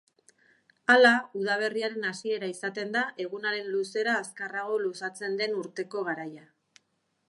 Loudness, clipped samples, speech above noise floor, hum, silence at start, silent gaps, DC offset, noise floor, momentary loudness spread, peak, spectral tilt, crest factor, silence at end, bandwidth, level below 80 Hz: -28 LUFS; under 0.1%; 47 dB; none; 0.9 s; none; under 0.1%; -76 dBFS; 13 LU; -6 dBFS; -3.5 dB/octave; 22 dB; 0.9 s; 11.5 kHz; -86 dBFS